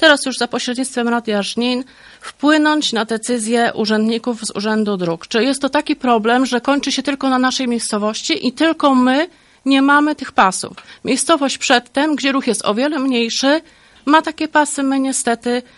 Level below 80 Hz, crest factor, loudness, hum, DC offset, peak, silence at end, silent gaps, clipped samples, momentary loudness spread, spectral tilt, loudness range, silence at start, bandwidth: -58 dBFS; 16 dB; -16 LUFS; none; under 0.1%; 0 dBFS; 0.15 s; none; under 0.1%; 7 LU; -3 dB/octave; 2 LU; 0 s; 11.5 kHz